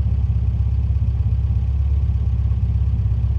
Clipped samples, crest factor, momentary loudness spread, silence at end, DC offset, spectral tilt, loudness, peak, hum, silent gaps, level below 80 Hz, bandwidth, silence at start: under 0.1%; 10 dB; 1 LU; 0 s; under 0.1%; -10 dB/octave; -21 LUFS; -8 dBFS; none; none; -20 dBFS; 3.3 kHz; 0 s